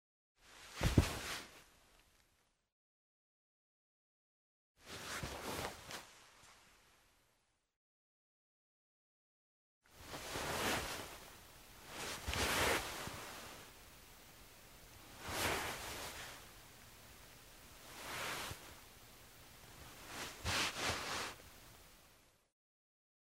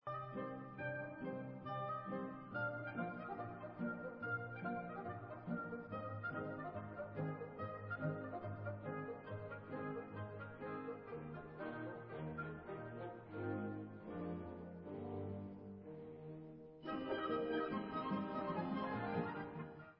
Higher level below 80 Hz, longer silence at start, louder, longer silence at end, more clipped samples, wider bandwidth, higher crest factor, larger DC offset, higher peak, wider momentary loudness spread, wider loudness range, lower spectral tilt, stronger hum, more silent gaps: first, -56 dBFS vs -70 dBFS; first, 0.4 s vs 0.05 s; first, -41 LUFS vs -46 LUFS; first, 1.2 s vs 0.05 s; neither; first, 16 kHz vs 5.4 kHz; first, 32 dB vs 18 dB; neither; first, -14 dBFS vs -28 dBFS; first, 22 LU vs 8 LU; first, 11 LU vs 5 LU; second, -3 dB/octave vs -6 dB/octave; neither; first, 2.72-4.75 s, 7.76-9.81 s vs none